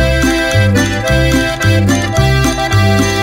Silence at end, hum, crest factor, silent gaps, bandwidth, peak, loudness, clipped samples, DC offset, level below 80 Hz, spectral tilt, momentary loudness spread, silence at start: 0 s; none; 10 dB; none; 16.5 kHz; 0 dBFS; -12 LUFS; under 0.1%; under 0.1%; -22 dBFS; -5 dB/octave; 2 LU; 0 s